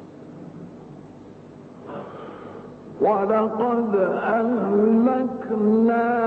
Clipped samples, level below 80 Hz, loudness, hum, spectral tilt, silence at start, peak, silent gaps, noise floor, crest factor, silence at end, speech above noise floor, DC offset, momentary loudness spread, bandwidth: under 0.1%; -64 dBFS; -21 LUFS; none; -9.5 dB/octave; 0 s; -8 dBFS; none; -43 dBFS; 14 dB; 0 s; 23 dB; under 0.1%; 22 LU; 4.4 kHz